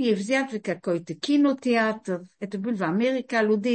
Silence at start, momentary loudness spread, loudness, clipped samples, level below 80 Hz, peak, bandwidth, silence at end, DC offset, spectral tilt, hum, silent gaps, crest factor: 0 s; 10 LU; -25 LUFS; under 0.1%; -74 dBFS; -10 dBFS; 8.8 kHz; 0 s; under 0.1%; -5.5 dB/octave; none; none; 14 dB